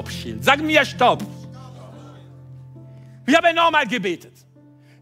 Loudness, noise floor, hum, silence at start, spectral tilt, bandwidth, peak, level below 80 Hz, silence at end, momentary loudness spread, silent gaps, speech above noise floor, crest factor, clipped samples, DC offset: -18 LUFS; -49 dBFS; none; 0 s; -4 dB/octave; 16 kHz; -2 dBFS; -56 dBFS; 0.85 s; 24 LU; none; 31 dB; 20 dB; under 0.1%; under 0.1%